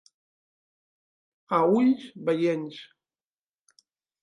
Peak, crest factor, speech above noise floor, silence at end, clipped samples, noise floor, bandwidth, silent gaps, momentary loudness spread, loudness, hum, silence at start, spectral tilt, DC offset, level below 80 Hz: -10 dBFS; 20 dB; over 66 dB; 1.4 s; under 0.1%; under -90 dBFS; 10.5 kHz; none; 15 LU; -25 LUFS; none; 1.5 s; -7.5 dB/octave; under 0.1%; -78 dBFS